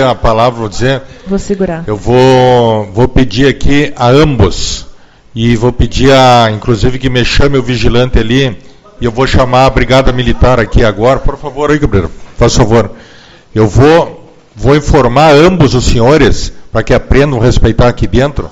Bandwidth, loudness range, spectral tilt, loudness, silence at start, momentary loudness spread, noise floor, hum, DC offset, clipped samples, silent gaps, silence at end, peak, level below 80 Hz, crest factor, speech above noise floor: 9.2 kHz; 3 LU; -6 dB/octave; -9 LUFS; 0 s; 11 LU; -36 dBFS; none; under 0.1%; 2%; none; 0 s; 0 dBFS; -18 dBFS; 8 dB; 29 dB